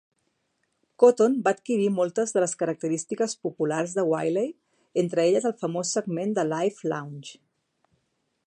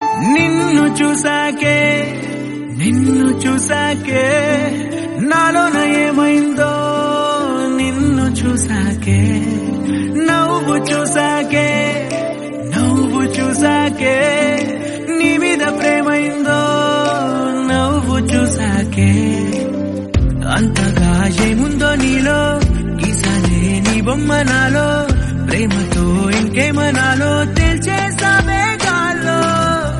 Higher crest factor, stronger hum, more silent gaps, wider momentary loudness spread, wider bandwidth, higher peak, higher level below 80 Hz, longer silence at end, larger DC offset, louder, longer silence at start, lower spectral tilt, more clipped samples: first, 20 dB vs 14 dB; neither; neither; first, 10 LU vs 5 LU; about the same, 10.5 kHz vs 11.5 kHz; second, -6 dBFS vs 0 dBFS; second, -78 dBFS vs -28 dBFS; first, 1.15 s vs 0 s; neither; second, -25 LUFS vs -14 LUFS; first, 1 s vs 0 s; about the same, -5 dB/octave vs -5 dB/octave; neither